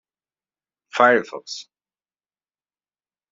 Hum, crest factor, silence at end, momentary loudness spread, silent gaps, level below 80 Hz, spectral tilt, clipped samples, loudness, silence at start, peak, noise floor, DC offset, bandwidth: none; 24 dB; 1.7 s; 18 LU; none; -78 dBFS; -1 dB/octave; under 0.1%; -18 LUFS; 0.95 s; -2 dBFS; under -90 dBFS; under 0.1%; 7.8 kHz